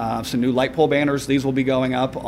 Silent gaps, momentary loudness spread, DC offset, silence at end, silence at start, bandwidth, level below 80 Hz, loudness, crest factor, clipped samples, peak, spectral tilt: none; 4 LU; under 0.1%; 0 s; 0 s; 15.5 kHz; -46 dBFS; -20 LUFS; 14 dB; under 0.1%; -6 dBFS; -6 dB/octave